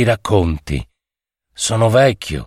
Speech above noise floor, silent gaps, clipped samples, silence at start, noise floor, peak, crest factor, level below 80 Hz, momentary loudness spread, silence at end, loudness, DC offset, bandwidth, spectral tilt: 70 dB; none; under 0.1%; 0 s; -86 dBFS; -2 dBFS; 16 dB; -32 dBFS; 12 LU; 0 s; -16 LUFS; under 0.1%; 14.5 kHz; -5 dB/octave